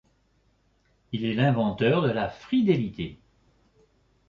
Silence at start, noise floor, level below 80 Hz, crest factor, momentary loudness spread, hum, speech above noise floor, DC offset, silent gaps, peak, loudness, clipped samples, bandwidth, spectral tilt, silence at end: 1.1 s; -67 dBFS; -56 dBFS; 18 dB; 13 LU; none; 42 dB; under 0.1%; none; -10 dBFS; -26 LUFS; under 0.1%; 7 kHz; -8.5 dB/octave; 1.15 s